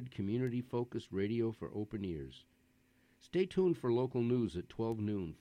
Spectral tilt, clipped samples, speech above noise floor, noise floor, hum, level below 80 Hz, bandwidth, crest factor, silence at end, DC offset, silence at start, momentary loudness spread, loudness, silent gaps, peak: -8.5 dB/octave; under 0.1%; 35 dB; -71 dBFS; none; -64 dBFS; 10 kHz; 16 dB; 0.05 s; under 0.1%; 0 s; 9 LU; -37 LUFS; none; -20 dBFS